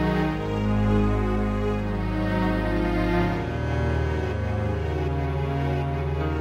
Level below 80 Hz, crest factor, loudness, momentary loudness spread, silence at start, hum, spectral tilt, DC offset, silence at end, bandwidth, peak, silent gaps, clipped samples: -30 dBFS; 12 dB; -25 LUFS; 4 LU; 0 s; none; -8 dB/octave; under 0.1%; 0 s; 11.5 kHz; -12 dBFS; none; under 0.1%